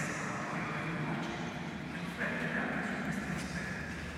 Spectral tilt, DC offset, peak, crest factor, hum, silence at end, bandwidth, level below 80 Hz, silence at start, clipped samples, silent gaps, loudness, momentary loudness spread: -5 dB/octave; under 0.1%; -22 dBFS; 16 dB; none; 0 s; 15 kHz; -56 dBFS; 0 s; under 0.1%; none; -37 LUFS; 5 LU